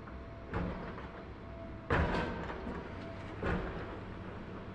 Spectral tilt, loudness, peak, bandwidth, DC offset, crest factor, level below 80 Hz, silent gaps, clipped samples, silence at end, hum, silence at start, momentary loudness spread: -7.5 dB/octave; -40 LUFS; -18 dBFS; 9.4 kHz; under 0.1%; 22 dB; -48 dBFS; none; under 0.1%; 0 s; none; 0 s; 13 LU